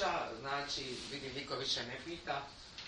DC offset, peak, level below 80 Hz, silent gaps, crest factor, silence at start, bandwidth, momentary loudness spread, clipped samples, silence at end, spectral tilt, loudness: under 0.1%; -24 dBFS; -64 dBFS; none; 18 dB; 0 s; 11 kHz; 7 LU; under 0.1%; 0 s; -2.5 dB/octave; -40 LUFS